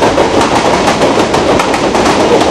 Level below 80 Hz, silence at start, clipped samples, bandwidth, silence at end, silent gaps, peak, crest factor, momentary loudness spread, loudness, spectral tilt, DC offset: -32 dBFS; 0 s; 0.3%; 15 kHz; 0 s; none; 0 dBFS; 8 dB; 1 LU; -9 LUFS; -4 dB/octave; under 0.1%